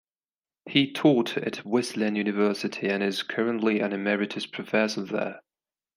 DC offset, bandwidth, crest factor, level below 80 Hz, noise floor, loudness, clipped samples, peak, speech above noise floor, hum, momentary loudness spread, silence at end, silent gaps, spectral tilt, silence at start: under 0.1%; 15.5 kHz; 22 dB; -74 dBFS; under -90 dBFS; -26 LUFS; under 0.1%; -4 dBFS; over 64 dB; none; 9 LU; 0.55 s; none; -5 dB/octave; 0.65 s